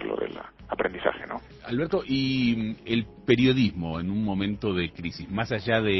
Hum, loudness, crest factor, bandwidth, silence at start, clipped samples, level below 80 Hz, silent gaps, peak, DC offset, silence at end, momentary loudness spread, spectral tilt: none; -27 LUFS; 20 dB; 6 kHz; 0 s; under 0.1%; -48 dBFS; none; -6 dBFS; under 0.1%; 0 s; 13 LU; -7.5 dB/octave